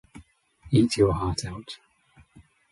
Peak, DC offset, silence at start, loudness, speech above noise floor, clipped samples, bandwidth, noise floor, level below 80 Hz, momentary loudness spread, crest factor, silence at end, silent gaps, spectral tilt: -8 dBFS; under 0.1%; 0.15 s; -24 LUFS; 35 dB; under 0.1%; 11.5 kHz; -59 dBFS; -44 dBFS; 20 LU; 20 dB; 0.95 s; none; -6 dB/octave